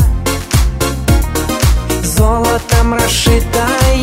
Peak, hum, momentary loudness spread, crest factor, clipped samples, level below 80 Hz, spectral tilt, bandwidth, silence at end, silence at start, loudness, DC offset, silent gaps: 0 dBFS; none; 4 LU; 12 dB; under 0.1%; -16 dBFS; -4.5 dB/octave; 16.5 kHz; 0 s; 0 s; -13 LUFS; under 0.1%; none